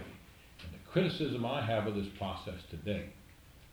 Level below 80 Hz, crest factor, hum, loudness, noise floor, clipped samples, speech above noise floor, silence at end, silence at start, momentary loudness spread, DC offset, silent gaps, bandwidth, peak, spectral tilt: -58 dBFS; 20 dB; none; -36 LUFS; -57 dBFS; under 0.1%; 22 dB; 0 s; 0 s; 18 LU; under 0.1%; none; over 20 kHz; -18 dBFS; -7 dB/octave